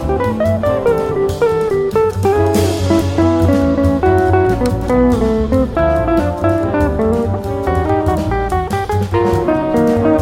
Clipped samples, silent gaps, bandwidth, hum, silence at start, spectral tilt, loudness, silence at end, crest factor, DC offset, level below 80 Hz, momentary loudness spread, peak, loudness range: under 0.1%; none; 16.5 kHz; none; 0 s; -7.5 dB/octave; -14 LUFS; 0 s; 12 dB; under 0.1%; -26 dBFS; 4 LU; -2 dBFS; 2 LU